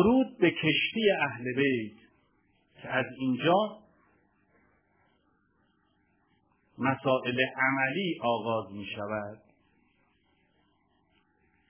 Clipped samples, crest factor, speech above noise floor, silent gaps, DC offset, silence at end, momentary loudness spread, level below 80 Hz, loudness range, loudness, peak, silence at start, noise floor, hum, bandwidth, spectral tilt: under 0.1%; 20 dB; 43 dB; none; under 0.1%; 2.35 s; 11 LU; -66 dBFS; 8 LU; -28 LUFS; -12 dBFS; 0 s; -71 dBFS; none; 3.5 kHz; -3.5 dB/octave